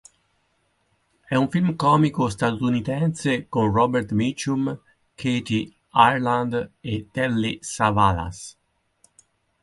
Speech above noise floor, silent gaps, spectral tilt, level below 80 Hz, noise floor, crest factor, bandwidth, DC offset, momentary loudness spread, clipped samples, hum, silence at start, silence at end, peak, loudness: 47 dB; none; -6 dB/octave; -48 dBFS; -68 dBFS; 22 dB; 11.5 kHz; under 0.1%; 11 LU; under 0.1%; none; 1.3 s; 1.15 s; 0 dBFS; -22 LUFS